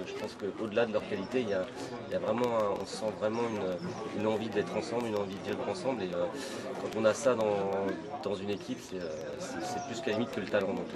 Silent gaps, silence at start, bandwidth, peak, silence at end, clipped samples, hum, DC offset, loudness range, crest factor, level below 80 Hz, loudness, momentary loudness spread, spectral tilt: none; 0 s; 13 kHz; -12 dBFS; 0 s; under 0.1%; none; under 0.1%; 2 LU; 22 dB; -68 dBFS; -33 LUFS; 9 LU; -5 dB/octave